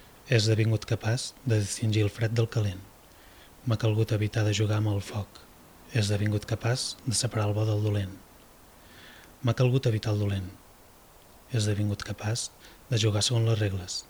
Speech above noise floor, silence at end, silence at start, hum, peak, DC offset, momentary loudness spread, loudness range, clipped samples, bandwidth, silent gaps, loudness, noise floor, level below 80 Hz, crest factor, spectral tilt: 27 dB; 0.05 s; 0.25 s; none; -10 dBFS; under 0.1%; 11 LU; 2 LU; under 0.1%; 19 kHz; none; -28 LUFS; -54 dBFS; -56 dBFS; 20 dB; -5 dB/octave